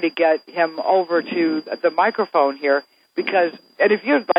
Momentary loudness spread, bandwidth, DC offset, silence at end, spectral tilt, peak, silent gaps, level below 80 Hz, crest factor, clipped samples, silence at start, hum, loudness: 4 LU; 5.2 kHz; under 0.1%; 0 s; -7 dB/octave; -2 dBFS; none; -88 dBFS; 18 dB; under 0.1%; 0 s; none; -20 LUFS